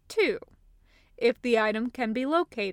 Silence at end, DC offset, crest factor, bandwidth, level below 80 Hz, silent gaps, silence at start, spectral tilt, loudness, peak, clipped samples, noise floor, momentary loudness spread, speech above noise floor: 0 s; under 0.1%; 16 dB; 13.5 kHz; -62 dBFS; none; 0.1 s; -5 dB/octave; -27 LUFS; -12 dBFS; under 0.1%; -60 dBFS; 5 LU; 33 dB